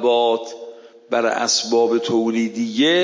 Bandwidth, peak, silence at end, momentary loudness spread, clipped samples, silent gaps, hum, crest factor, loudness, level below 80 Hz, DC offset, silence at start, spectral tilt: 7.6 kHz; -4 dBFS; 0 s; 13 LU; under 0.1%; none; none; 14 dB; -19 LUFS; -74 dBFS; under 0.1%; 0 s; -3 dB/octave